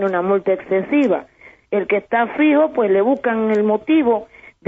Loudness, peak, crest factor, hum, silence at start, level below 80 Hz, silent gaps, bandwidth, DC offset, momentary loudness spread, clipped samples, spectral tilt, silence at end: -17 LUFS; -4 dBFS; 12 dB; none; 0 s; -60 dBFS; none; 3.9 kHz; under 0.1%; 5 LU; under 0.1%; -5 dB/octave; 0.45 s